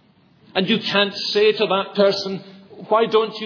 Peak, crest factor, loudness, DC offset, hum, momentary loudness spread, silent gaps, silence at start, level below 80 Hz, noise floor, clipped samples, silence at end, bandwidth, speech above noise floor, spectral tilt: -2 dBFS; 18 dB; -19 LUFS; under 0.1%; none; 8 LU; none; 0.55 s; -68 dBFS; -54 dBFS; under 0.1%; 0 s; 5.4 kHz; 35 dB; -5 dB/octave